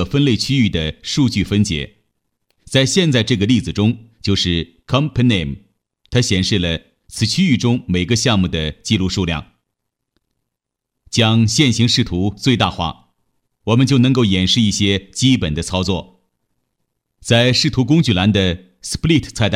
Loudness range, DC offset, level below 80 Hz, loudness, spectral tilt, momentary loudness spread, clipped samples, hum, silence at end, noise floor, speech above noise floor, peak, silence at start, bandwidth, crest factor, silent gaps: 2 LU; under 0.1%; -38 dBFS; -16 LUFS; -5 dB/octave; 9 LU; under 0.1%; none; 0 s; -79 dBFS; 64 dB; 0 dBFS; 0 s; 14.5 kHz; 16 dB; none